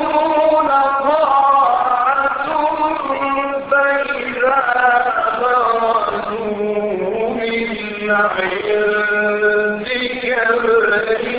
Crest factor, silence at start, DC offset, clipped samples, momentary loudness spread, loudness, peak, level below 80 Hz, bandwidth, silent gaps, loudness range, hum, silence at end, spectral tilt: 14 dB; 0 s; under 0.1%; under 0.1%; 6 LU; -16 LUFS; -2 dBFS; -50 dBFS; 5 kHz; none; 3 LU; none; 0 s; -8.5 dB/octave